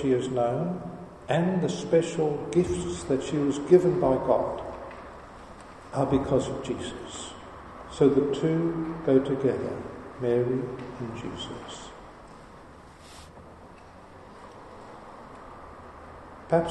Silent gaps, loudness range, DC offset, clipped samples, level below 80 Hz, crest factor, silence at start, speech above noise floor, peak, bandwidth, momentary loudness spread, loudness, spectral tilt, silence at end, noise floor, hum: none; 21 LU; under 0.1%; under 0.1%; -52 dBFS; 22 dB; 0 s; 22 dB; -6 dBFS; 10 kHz; 23 LU; -27 LUFS; -6.5 dB/octave; 0 s; -48 dBFS; none